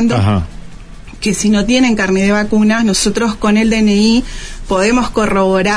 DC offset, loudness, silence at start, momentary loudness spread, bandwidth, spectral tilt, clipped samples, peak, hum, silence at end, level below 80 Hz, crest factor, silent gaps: under 0.1%; -13 LUFS; 0 s; 7 LU; 11 kHz; -5 dB/octave; under 0.1%; -2 dBFS; none; 0 s; -30 dBFS; 10 dB; none